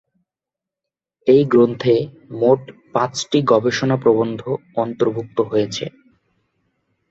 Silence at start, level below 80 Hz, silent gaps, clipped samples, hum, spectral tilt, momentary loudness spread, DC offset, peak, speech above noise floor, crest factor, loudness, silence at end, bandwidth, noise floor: 1.25 s; -60 dBFS; none; under 0.1%; none; -6 dB/octave; 10 LU; under 0.1%; -2 dBFS; 70 dB; 18 dB; -18 LUFS; 1.2 s; 8 kHz; -87 dBFS